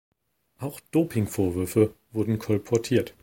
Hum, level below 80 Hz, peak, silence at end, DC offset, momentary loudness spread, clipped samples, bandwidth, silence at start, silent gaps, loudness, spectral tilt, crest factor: none; -56 dBFS; -8 dBFS; 0.1 s; under 0.1%; 10 LU; under 0.1%; 17 kHz; 0.6 s; none; -26 LUFS; -7 dB/octave; 18 dB